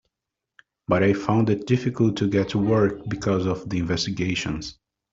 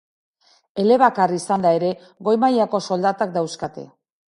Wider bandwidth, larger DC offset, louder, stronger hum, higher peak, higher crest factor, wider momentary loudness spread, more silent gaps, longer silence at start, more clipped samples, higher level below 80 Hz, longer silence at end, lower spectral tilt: second, 7.8 kHz vs 11.5 kHz; neither; second, -23 LUFS vs -19 LUFS; neither; second, -6 dBFS vs -2 dBFS; about the same, 18 dB vs 18 dB; second, 7 LU vs 14 LU; neither; first, 0.9 s vs 0.75 s; neither; first, -50 dBFS vs -64 dBFS; about the same, 0.4 s vs 0.5 s; about the same, -6.5 dB/octave vs -5.5 dB/octave